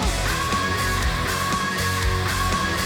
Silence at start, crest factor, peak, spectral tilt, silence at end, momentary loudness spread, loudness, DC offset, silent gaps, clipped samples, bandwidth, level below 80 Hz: 0 s; 12 dB; -12 dBFS; -3.5 dB/octave; 0 s; 1 LU; -22 LUFS; under 0.1%; none; under 0.1%; 19.5 kHz; -30 dBFS